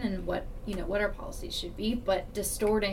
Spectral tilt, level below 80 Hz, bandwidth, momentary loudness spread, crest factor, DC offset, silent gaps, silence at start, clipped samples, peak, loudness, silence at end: -4 dB/octave; -40 dBFS; 17 kHz; 8 LU; 14 dB; under 0.1%; none; 0 s; under 0.1%; -16 dBFS; -32 LUFS; 0 s